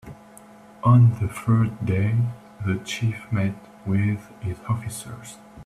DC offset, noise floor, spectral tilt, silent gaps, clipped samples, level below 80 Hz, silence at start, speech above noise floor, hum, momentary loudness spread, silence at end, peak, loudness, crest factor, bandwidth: under 0.1%; -47 dBFS; -7 dB/octave; none; under 0.1%; -52 dBFS; 0.05 s; 25 dB; none; 18 LU; 0 s; -6 dBFS; -23 LUFS; 18 dB; 13 kHz